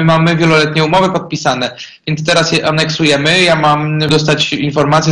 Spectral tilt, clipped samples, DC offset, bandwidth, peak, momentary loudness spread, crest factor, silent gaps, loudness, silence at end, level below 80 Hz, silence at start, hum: -5 dB/octave; under 0.1%; under 0.1%; 10.5 kHz; 0 dBFS; 7 LU; 12 dB; none; -11 LUFS; 0 s; -44 dBFS; 0 s; none